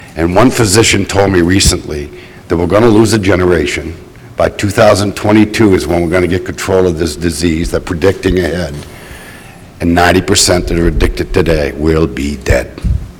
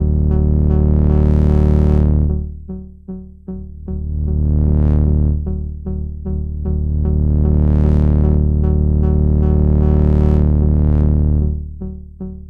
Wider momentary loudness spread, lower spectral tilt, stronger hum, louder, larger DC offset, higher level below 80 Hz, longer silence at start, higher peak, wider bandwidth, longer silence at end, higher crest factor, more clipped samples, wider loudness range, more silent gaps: second, 13 LU vs 17 LU; second, -5 dB/octave vs -12 dB/octave; neither; first, -11 LUFS vs -15 LUFS; neither; second, -24 dBFS vs -16 dBFS; about the same, 0 s vs 0 s; about the same, 0 dBFS vs 0 dBFS; first, 19.5 kHz vs 2.3 kHz; about the same, 0 s vs 0 s; about the same, 12 dB vs 14 dB; neither; about the same, 4 LU vs 5 LU; neither